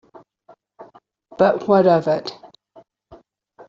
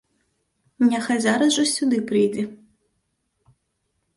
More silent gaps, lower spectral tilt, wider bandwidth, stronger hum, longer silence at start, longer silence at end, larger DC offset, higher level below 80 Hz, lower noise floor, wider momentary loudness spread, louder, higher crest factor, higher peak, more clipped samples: neither; first, -5.5 dB/octave vs -3.5 dB/octave; second, 7.4 kHz vs 11.5 kHz; neither; about the same, 0.8 s vs 0.8 s; second, 0.55 s vs 1.6 s; neither; first, -62 dBFS vs -68 dBFS; second, -53 dBFS vs -74 dBFS; first, 10 LU vs 5 LU; first, -17 LUFS vs -21 LUFS; about the same, 20 dB vs 16 dB; first, -2 dBFS vs -8 dBFS; neither